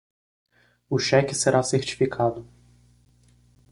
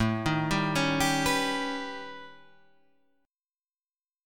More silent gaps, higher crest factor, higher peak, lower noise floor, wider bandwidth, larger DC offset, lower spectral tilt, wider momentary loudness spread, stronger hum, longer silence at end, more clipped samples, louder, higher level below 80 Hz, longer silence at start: second, none vs 3.57-3.61 s; about the same, 22 dB vs 18 dB; first, -4 dBFS vs -12 dBFS; second, -57 dBFS vs under -90 dBFS; second, 11.5 kHz vs 17.5 kHz; neither; about the same, -4.5 dB/octave vs -4 dB/octave; second, 7 LU vs 15 LU; first, 60 Hz at -45 dBFS vs none; first, 1.3 s vs 0 s; neither; first, -23 LUFS vs -28 LUFS; second, -58 dBFS vs -50 dBFS; first, 0.9 s vs 0 s